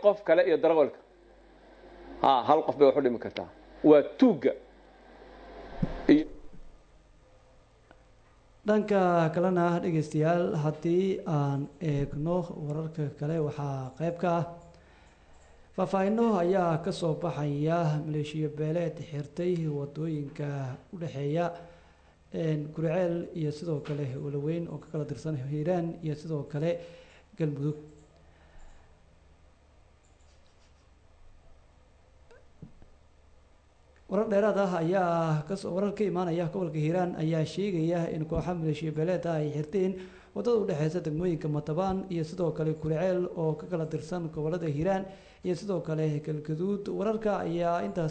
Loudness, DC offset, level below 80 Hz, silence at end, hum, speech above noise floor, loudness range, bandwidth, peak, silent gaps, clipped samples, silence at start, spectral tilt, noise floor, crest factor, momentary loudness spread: -29 LUFS; under 0.1%; -56 dBFS; 0 s; none; 31 dB; 7 LU; 9 kHz; -8 dBFS; none; under 0.1%; 0 s; -8 dB/octave; -60 dBFS; 22 dB; 11 LU